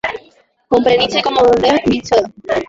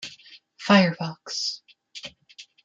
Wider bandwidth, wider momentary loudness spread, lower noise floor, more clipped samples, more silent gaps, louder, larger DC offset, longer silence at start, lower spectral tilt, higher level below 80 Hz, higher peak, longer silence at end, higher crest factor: about the same, 7.8 kHz vs 7.8 kHz; second, 8 LU vs 21 LU; about the same, -50 dBFS vs -51 dBFS; neither; neither; first, -14 LUFS vs -23 LUFS; neither; about the same, 0.05 s vs 0 s; about the same, -4.5 dB/octave vs -5 dB/octave; first, -44 dBFS vs -70 dBFS; first, 0 dBFS vs -4 dBFS; second, 0.05 s vs 0.25 s; second, 14 dB vs 22 dB